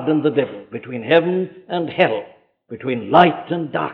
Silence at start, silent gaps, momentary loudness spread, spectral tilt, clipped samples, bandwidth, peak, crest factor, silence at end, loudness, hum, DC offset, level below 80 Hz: 0 s; none; 16 LU; -8.5 dB/octave; under 0.1%; 5.6 kHz; -2 dBFS; 18 dB; 0 s; -18 LUFS; none; under 0.1%; -60 dBFS